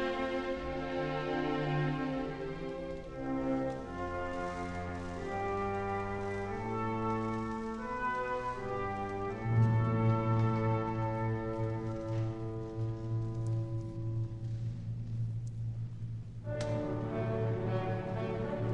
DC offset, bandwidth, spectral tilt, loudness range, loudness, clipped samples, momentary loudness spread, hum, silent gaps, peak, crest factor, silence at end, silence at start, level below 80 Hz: under 0.1%; 8.4 kHz; -8 dB/octave; 6 LU; -36 LUFS; under 0.1%; 9 LU; none; none; -18 dBFS; 16 dB; 0 s; 0 s; -52 dBFS